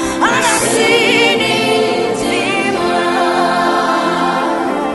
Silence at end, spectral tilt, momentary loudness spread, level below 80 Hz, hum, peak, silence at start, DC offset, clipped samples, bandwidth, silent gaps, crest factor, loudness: 0 s; -3 dB/octave; 5 LU; -46 dBFS; none; 0 dBFS; 0 s; under 0.1%; under 0.1%; 12 kHz; none; 14 dB; -13 LUFS